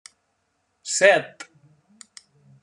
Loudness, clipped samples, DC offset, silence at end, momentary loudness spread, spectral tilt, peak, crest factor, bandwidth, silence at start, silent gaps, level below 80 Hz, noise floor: -19 LUFS; under 0.1%; under 0.1%; 1.2 s; 26 LU; -1.5 dB/octave; -4 dBFS; 22 dB; 10.5 kHz; 0.85 s; none; -84 dBFS; -72 dBFS